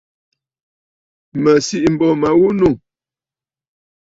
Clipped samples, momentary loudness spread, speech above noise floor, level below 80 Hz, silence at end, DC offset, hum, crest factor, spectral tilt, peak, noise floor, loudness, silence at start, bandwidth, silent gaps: under 0.1%; 8 LU; over 77 dB; -48 dBFS; 1.3 s; under 0.1%; none; 16 dB; -6 dB/octave; -2 dBFS; under -90 dBFS; -14 LUFS; 1.35 s; 8 kHz; none